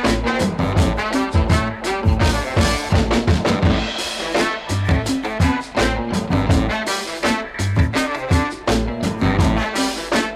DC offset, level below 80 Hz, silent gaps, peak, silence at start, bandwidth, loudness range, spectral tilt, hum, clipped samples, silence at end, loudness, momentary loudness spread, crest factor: under 0.1%; -26 dBFS; none; -2 dBFS; 0 s; 14.5 kHz; 1 LU; -5.5 dB/octave; none; under 0.1%; 0 s; -19 LUFS; 4 LU; 16 dB